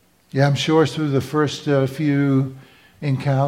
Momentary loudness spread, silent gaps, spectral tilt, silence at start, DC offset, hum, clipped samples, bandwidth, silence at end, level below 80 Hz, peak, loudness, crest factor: 8 LU; none; -6.5 dB/octave; 0.35 s; under 0.1%; none; under 0.1%; 13 kHz; 0 s; -58 dBFS; -4 dBFS; -20 LUFS; 16 dB